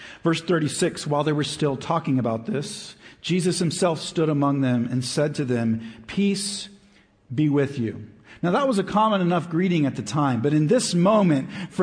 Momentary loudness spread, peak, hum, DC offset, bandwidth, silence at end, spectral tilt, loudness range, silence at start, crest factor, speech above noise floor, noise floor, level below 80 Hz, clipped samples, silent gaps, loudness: 10 LU; -8 dBFS; none; under 0.1%; 10.5 kHz; 0 s; -5.5 dB/octave; 4 LU; 0 s; 14 dB; 34 dB; -56 dBFS; -60 dBFS; under 0.1%; none; -23 LUFS